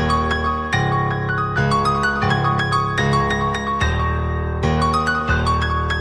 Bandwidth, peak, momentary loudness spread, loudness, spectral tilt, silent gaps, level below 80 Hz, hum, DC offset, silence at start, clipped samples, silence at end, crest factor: 10.5 kHz; -4 dBFS; 3 LU; -19 LUFS; -6 dB/octave; none; -28 dBFS; none; under 0.1%; 0 s; under 0.1%; 0 s; 14 dB